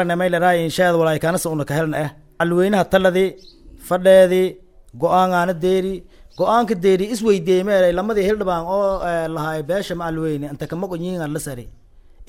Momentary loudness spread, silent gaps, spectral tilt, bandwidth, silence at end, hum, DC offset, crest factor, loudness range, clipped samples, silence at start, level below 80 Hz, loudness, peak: 10 LU; none; -6 dB/octave; 16.5 kHz; 0.05 s; none; under 0.1%; 16 dB; 5 LU; under 0.1%; 0 s; -44 dBFS; -18 LUFS; -2 dBFS